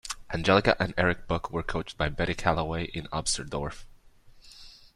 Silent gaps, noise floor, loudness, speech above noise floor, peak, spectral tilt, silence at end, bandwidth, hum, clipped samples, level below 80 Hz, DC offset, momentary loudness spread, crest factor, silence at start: none; -54 dBFS; -28 LUFS; 26 dB; -8 dBFS; -4.5 dB/octave; 0.25 s; 13 kHz; none; under 0.1%; -44 dBFS; under 0.1%; 13 LU; 22 dB; 0.05 s